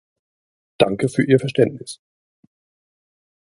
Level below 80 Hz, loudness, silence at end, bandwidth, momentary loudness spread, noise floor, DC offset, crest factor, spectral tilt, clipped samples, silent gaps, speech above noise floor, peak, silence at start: -58 dBFS; -19 LUFS; 1.65 s; 11.5 kHz; 19 LU; under -90 dBFS; under 0.1%; 22 dB; -6.5 dB/octave; under 0.1%; none; over 72 dB; 0 dBFS; 0.8 s